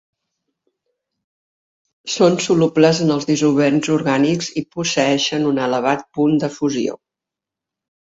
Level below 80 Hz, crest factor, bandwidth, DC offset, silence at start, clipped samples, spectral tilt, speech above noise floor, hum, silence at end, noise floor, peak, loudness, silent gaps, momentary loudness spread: -60 dBFS; 18 dB; 8 kHz; under 0.1%; 2.05 s; under 0.1%; -5 dB/octave; 69 dB; none; 1.15 s; -86 dBFS; 0 dBFS; -17 LUFS; none; 8 LU